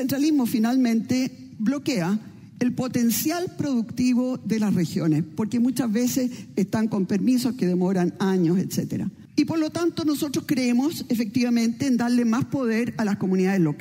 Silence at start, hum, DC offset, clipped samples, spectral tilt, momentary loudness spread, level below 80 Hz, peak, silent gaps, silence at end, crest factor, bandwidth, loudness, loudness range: 0 s; none; under 0.1%; under 0.1%; -6 dB/octave; 5 LU; -64 dBFS; -8 dBFS; none; 0 s; 16 dB; 16 kHz; -24 LUFS; 1 LU